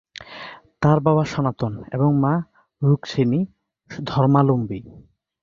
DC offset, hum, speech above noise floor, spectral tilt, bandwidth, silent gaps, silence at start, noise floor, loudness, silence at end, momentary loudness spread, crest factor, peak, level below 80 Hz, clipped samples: under 0.1%; none; 20 dB; -8.5 dB/octave; 7.2 kHz; none; 0.2 s; -40 dBFS; -20 LUFS; 0.45 s; 20 LU; 18 dB; -2 dBFS; -52 dBFS; under 0.1%